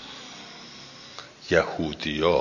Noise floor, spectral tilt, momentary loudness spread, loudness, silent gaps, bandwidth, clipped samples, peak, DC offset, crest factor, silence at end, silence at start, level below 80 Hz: -44 dBFS; -5 dB/octave; 18 LU; -25 LUFS; none; 7.4 kHz; under 0.1%; -4 dBFS; under 0.1%; 22 dB; 0 s; 0 s; -48 dBFS